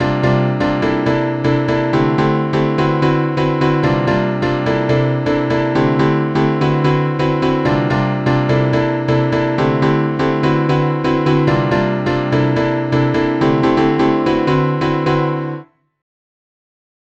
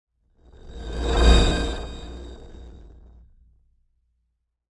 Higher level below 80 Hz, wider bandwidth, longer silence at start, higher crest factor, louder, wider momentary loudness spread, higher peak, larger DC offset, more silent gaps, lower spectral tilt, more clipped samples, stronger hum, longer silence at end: second, -38 dBFS vs -26 dBFS; second, 8 kHz vs 10.5 kHz; second, 0 s vs 0.65 s; second, 14 dB vs 22 dB; first, -15 LUFS vs -22 LUFS; second, 2 LU vs 27 LU; about the same, -2 dBFS vs -4 dBFS; neither; neither; first, -8 dB/octave vs -5 dB/octave; neither; neither; second, 1.4 s vs 1.9 s